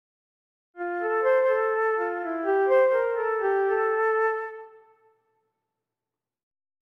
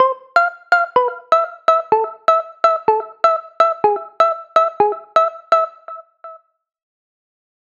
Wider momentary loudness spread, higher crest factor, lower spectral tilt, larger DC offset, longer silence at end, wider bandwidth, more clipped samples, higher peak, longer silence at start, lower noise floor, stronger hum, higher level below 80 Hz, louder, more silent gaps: first, 12 LU vs 4 LU; about the same, 14 dB vs 16 dB; first, -5 dB/octave vs -3.5 dB/octave; neither; first, 2.25 s vs 1.3 s; second, 5.6 kHz vs 7.6 kHz; neither; second, -12 dBFS vs 0 dBFS; first, 0.75 s vs 0 s; first, -90 dBFS vs -40 dBFS; neither; about the same, -72 dBFS vs -68 dBFS; second, -24 LUFS vs -16 LUFS; neither